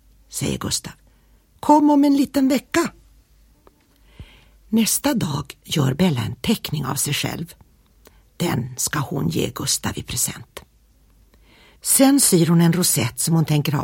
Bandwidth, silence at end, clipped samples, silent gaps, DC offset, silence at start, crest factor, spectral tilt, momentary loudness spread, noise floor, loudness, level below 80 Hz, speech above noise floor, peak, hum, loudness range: 17 kHz; 0 s; under 0.1%; none; under 0.1%; 0.3 s; 20 dB; -4.5 dB/octave; 12 LU; -55 dBFS; -19 LUFS; -48 dBFS; 36 dB; -2 dBFS; none; 6 LU